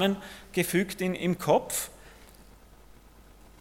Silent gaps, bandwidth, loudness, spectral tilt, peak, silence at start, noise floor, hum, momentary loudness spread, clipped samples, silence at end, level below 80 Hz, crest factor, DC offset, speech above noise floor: none; 17 kHz; -29 LUFS; -4.5 dB/octave; -8 dBFS; 0 s; -53 dBFS; none; 9 LU; under 0.1%; 1.2 s; -56 dBFS; 22 dB; under 0.1%; 25 dB